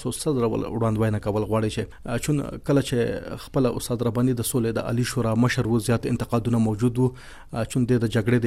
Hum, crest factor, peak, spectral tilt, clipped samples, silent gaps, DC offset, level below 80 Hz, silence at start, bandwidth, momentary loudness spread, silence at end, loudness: none; 14 dB; -8 dBFS; -6.5 dB/octave; under 0.1%; none; under 0.1%; -44 dBFS; 0 s; 16 kHz; 6 LU; 0 s; -24 LUFS